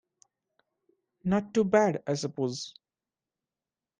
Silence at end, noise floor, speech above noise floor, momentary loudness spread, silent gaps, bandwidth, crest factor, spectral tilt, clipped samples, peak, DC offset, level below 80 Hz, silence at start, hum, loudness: 1.3 s; under -90 dBFS; over 63 dB; 13 LU; none; 9.8 kHz; 20 dB; -6 dB/octave; under 0.1%; -12 dBFS; under 0.1%; -68 dBFS; 1.25 s; none; -28 LUFS